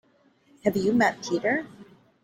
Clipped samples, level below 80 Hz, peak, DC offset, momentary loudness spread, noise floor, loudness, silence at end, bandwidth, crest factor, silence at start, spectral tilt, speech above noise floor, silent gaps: under 0.1%; -64 dBFS; -6 dBFS; under 0.1%; 7 LU; -62 dBFS; -25 LUFS; 0.4 s; 16.5 kHz; 20 dB; 0.65 s; -5.5 dB/octave; 38 dB; none